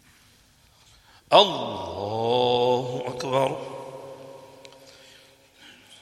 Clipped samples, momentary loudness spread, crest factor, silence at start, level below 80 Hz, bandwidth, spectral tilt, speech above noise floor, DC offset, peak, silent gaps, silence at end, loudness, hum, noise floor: under 0.1%; 24 LU; 26 dB; 1.3 s; -66 dBFS; 13.5 kHz; -4.5 dB/octave; 36 dB; under 0.1%; 0 dBFS; none; 0.05 s; -23 LUFS; none; -58 dBFS